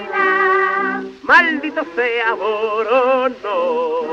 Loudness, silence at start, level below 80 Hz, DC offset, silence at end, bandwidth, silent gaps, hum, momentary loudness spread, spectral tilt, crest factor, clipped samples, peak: -16 LUFS; 0 s; -60 dBFS; under 0.1%; 0 s; 7.8 kHz; none; none; 9 LU; -4 dB/octave; 16 dB; under 0.1%; -2 dBFS